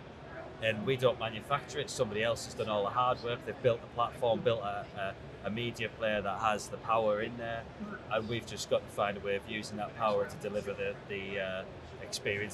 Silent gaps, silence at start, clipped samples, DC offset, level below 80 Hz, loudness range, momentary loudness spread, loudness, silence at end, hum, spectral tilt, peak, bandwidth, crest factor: none; 0 s; under 0.1%; under 0.1%; -60 dBFS; 3 LU; 9 LU; -34 LUFS; 0 s; none; -4.5 dB/octave; -14 dBFS; 13.5 kHz; 20 dB